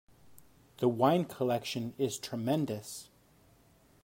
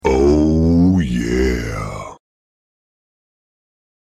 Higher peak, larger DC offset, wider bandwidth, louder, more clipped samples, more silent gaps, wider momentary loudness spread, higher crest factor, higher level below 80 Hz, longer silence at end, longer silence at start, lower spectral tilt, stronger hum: second, -14 dBFS vs -4 dBFS; neither; first, 16.5 kHz vs 13.5 kHz; second, -32 LUFS vs -16 LUFS; neither; neither; second, 11 LU vs 15 LU; first, 20 dB vs 14 dB; second, -70 dBFS vs -28 dBFS; second, 1 s vs 1.95 s; first, 0.3 s vs 0.05 s; second, -5.5 dB/octave vs -7.5 dB/octave; neither